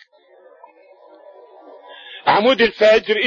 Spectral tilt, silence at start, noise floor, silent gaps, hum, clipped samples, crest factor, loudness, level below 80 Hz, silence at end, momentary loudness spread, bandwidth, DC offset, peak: -4.5 dB/octave; 2.1 s; -50 dBFS; none; none; under 0.1%; 16 dB; -15 LUFS; -56 dBFS; 0 s; 22 LU; 7.4 kHz; under 0.1%; -2 dBFS